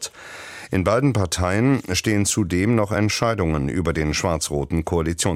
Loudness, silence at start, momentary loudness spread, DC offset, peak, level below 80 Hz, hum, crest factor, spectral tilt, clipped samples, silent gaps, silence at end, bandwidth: -21 LUFS; 0 s; 5 LU; under 0.1%; -6 dBFS; -38 dBFS; none; 16 dB; -5 dB/octave; under 0.1%; none; 0 s; 16 kHz